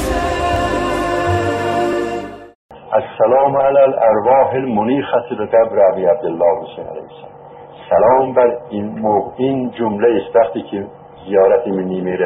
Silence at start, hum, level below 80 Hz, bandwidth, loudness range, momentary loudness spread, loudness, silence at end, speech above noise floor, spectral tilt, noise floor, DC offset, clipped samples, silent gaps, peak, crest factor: 0 s; none; -38 dBFS; 13 kHz; 3 LU; 12 LU; -15 LUFS; 0 s; 22 dB; -6.5 dB/octave; -36 dBFS; under 0.1%; under 0.1%; 2.55-2.69 s; 0 dBFS; 14 dB